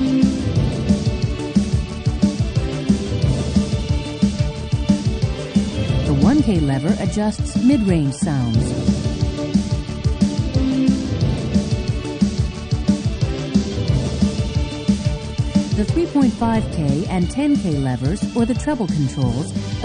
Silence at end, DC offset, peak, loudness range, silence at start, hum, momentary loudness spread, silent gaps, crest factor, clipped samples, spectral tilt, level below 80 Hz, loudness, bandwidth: 0 s; under 0.1%; -2 dBFS; 2 LU; 0 s; none; 5 LU; none; 16 dB; under 0.1%; -7 dB/octave; -28 dBFS; -20 LUFS; 10 kHz